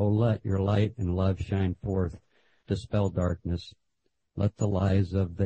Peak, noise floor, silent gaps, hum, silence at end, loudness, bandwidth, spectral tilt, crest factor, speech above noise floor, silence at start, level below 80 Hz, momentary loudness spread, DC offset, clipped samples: -12 dBFS; -79 dBFS; none; none; 0 s; -29 LUFS; 8.6 kHz; -8.5 dB/octave; 16 dB; 52 dB; 0 s; -50 dBFS; 9 LU; under 0.1%; under 0.1%